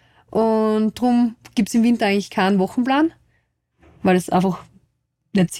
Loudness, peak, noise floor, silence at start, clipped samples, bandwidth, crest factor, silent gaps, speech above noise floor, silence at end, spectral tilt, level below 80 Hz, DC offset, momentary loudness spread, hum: -19 LUFS; -6 dBFS; -67 dBFS; 0.35 s; under 0.1%; 14.5 kHz; 14 dB; none; 49 dB; 0 s; -6 dB/octave; -56 dBFS; under 0.1%; 6 LU; none